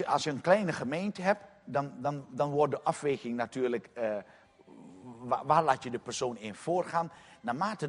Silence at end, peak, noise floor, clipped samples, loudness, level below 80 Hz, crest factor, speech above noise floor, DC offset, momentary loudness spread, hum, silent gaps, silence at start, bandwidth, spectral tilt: 0 s; -10 dBFS; -55 dBFS; under 0.1%; -32 LUFS; -72 dBFS; 22 dB; 24 dB; under 0.1%; 11 LU; none; none; 0 s; 10.5 kHz; -5.5 dB/octave